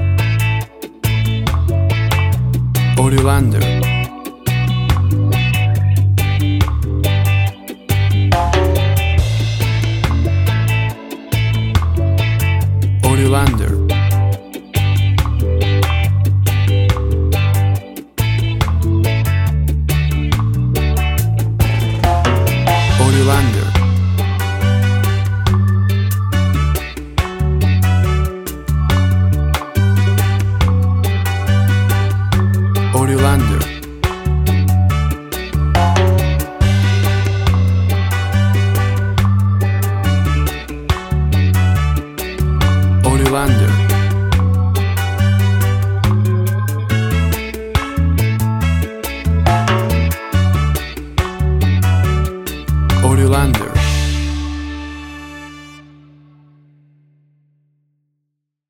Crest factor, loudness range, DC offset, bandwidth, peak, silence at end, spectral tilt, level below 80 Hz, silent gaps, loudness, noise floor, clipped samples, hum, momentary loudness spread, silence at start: 14 dB; 2 LU; under 0.1%; 18 kHz; 0 dBFS; 2.9 s; -6 dB/octave; -22 dBFS; none; -15 LUFS; -74 dBFS; under 0.1%; none; 7 LU; 0 s